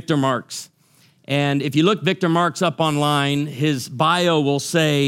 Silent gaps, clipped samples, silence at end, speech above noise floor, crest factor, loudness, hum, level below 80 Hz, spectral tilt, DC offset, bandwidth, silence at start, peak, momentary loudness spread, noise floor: none; under 0.1%; 0 s; 37 dB; 16 dB; -19 LUFS; none; -64 dBFS; -5 dB/octave; under 0.1%; 16 kHz; 0.1 s; -2 dBFS; 5 LU; -56 dBFS